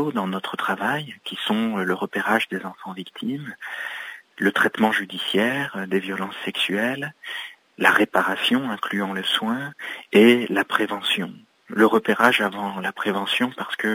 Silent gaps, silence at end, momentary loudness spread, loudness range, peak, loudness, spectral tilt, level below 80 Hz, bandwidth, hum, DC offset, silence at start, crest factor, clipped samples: none; 0 s; 14 LU; 5 LU; 0 dBFS; -22 LUFS; -4.5 dB/octave; -72 dBFS; 16 kHz; none; under 0.1%; 0 s; 22 dB; under 0.1%